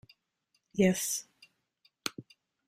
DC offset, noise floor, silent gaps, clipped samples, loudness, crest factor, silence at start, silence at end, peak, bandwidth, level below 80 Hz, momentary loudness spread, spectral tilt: under 0.1%; -78 dBFS; none; under 0.1%; -32 LUFS; 24 dB; 0.75 s; 0.45 s; -12 dBFS; 16 kHz; -70 dBFS; 13 LU; -4.5 dB/octave